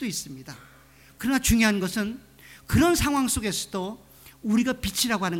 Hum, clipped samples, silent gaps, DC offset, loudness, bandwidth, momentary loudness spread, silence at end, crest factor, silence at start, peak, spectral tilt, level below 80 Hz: none; under 0.1%; none; under 0.1%; -25 LUFS; 17.5 kHz; 20 LU; 0 s; 18 dB; 0 s; -8 dBFS; -4 dB/octave; -40 dBFS